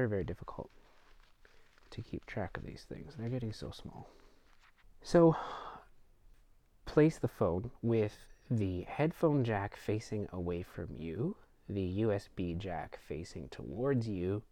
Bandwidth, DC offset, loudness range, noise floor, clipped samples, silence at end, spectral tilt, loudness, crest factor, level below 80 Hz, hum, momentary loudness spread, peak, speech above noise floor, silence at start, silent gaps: 15 kHz; under 0.1%; 11 LU; -64 dBFS; under 0.1%; 0.1 s; -8 dB/octave; -35 LUFS; 20 dB; -56 dBFS; none; 19 LU; -16 dBFS; 29 dB; 0 s; none